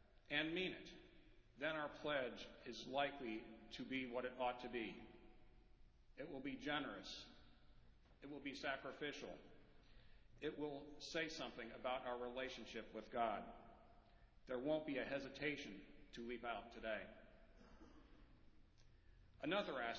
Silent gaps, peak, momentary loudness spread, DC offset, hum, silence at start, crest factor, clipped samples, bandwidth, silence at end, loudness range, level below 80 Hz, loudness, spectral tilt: none; -28 dBFS; 19 LU; under 0.1%; none; 0.05 s; 22 dB; under 0.1%; 7 kHz; 0 s; 6 LU; -70 dBFS; -48 LUFS; -2 dB/octave